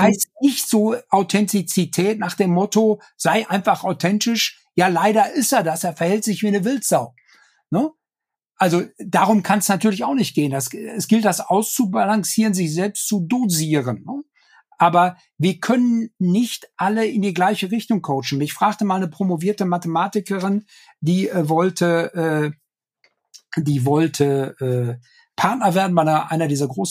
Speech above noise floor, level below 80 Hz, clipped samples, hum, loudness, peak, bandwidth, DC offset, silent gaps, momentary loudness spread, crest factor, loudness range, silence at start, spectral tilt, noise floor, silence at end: 69 dB; -70 dBFS; under 0.1%; none; -19 LUFS; -2 dBFS; 15.5 kHz; under 0.1%; none; 6 LU; 18 dB; 3 LU; 0 s; -5 dB/octave; -87 dBFS; 0 s